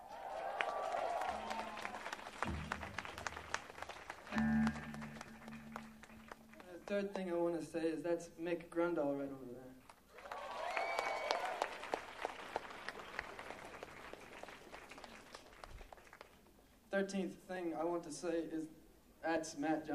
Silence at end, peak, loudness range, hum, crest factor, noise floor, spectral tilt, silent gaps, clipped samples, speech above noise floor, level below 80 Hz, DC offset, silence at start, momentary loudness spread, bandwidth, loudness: 0 s; -14 dBFS; 9 LU; none; 28 dB; -66 dBFS; -5 dB/octave; none; under 0.1%; 25 dB; -64 dBFS; under 0.1%; 0 s; 17 LU; 15 kHz; -43 LUFS